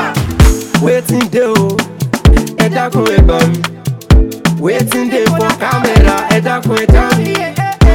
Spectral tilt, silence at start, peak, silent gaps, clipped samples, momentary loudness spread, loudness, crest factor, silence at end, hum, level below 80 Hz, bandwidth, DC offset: -6 dB/octave; 0 s; 0 dBFS; none; 3%; 6 LU; -11 LUFS; 10 dB; 0 s; none; -14 dBFS; 17 kHz; under 0.1%